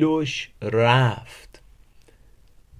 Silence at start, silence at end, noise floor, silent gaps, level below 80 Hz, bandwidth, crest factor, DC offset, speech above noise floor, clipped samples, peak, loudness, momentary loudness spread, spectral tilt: 0 s; 1.4 s; -52 dBFS; none; -54 dBFS; 11.5 kHz; 20 dB; under 0.1%; 31 dB; under 0.1%; -4 dBFS; -21 LUFS; 17 LU; -6.5 dB/octave